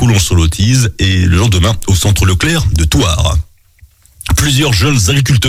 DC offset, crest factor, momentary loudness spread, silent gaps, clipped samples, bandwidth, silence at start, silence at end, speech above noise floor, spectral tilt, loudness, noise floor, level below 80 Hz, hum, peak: under 0.1%; 10 dB; 4 LU; none; under 0.1%; 16.5 kHz; 0 s; 0 s; 34 dB; -4.5 dB/octave; -11 LUFS; -44 dBFS; -20 dBFS; none; 0 dBFS